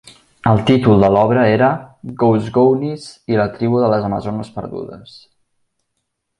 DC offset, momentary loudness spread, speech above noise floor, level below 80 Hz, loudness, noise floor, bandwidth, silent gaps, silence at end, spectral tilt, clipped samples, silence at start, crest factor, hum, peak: under 0.1%; 16 LU; 58 dB; -44 dBFS; -15 LUFS; -73 dBFS; 11 kHz; none; 1.35 s; -8 dB/octave; under 0.1%; 0.45 s; 16 dB; none; 0 dBFS